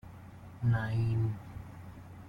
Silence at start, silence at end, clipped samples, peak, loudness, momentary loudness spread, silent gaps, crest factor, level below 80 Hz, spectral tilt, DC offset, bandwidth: 0.05 s; 0 s; under 0.1%; -20 dBFS; -33 LUFS; 20 LU; none; 14 dB; -56 dBFS; -8.5 dB/octave; under 0.1%; 5.2 kHz